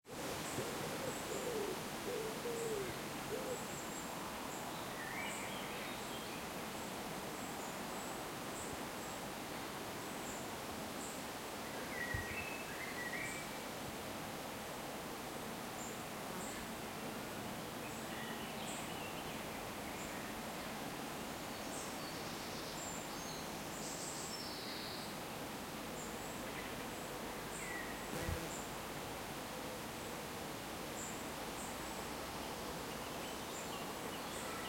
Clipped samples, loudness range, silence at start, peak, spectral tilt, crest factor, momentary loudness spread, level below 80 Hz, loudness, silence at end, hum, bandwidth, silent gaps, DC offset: under 0.1%; 2 LU; 0.05 s; -26 dBFS; -3 dB/octave; 18 dB; 3 LU; -64 dBFS; -44 LUFS; 0 s; none; 16.5 kHz; none; under 0.1%